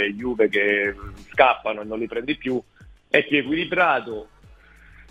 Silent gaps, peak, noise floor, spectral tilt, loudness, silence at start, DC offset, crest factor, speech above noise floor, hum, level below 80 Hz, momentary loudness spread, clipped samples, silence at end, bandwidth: none; 0 dBFS; -50 dBFS; -6 dB/octave; -22 LUFS; 0 s; under 0.1%; 24 dB; 28 dB; none; -50 dBFS; 11 LU; under 0.1%; 0.1 s; 9.2 kHz